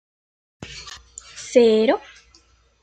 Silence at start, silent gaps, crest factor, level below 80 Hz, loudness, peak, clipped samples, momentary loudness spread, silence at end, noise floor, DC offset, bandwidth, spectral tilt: 0.6 s; none; 20 dB; -56 dBFS; -18 LUFS; -2 dBFS; under 0.1%; 23 LU; 0.85 s; -57 dBFS; under 0.1%; 9.2 kHz; -4 dB/octave